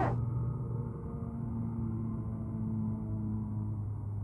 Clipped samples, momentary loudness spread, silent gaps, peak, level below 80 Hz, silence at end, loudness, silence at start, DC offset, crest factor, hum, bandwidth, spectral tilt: under 0.1%; 4 LU; none; -20 dBFS; -48 dBFS; 0 s; -37 LUFS; 0 s; under 0.1%; 16 dB; none; 3.1 kHz; -11 dB/octave